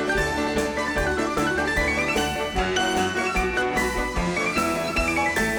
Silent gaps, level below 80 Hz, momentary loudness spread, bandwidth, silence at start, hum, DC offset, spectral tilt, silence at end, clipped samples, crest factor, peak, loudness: none; -36 dBFS; 3 LU; over 20 kHz; 0 s; none; under 0.1%; -4 dB/octave; 0 s; under 0.1%; 12 dB; -12 dBFS; -23 LUFS